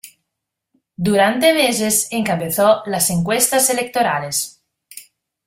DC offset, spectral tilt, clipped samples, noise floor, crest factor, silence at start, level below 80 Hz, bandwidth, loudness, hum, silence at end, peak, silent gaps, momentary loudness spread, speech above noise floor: under 0.1%; -3 dB/octave; under 0.1%; -80 dBFS; 18 dB; 0.05 s; -56 dBFS; 16 kHz; -16 LUFS; none; 0.45 s; 0 dBFS; none; 7 LU; 63 dB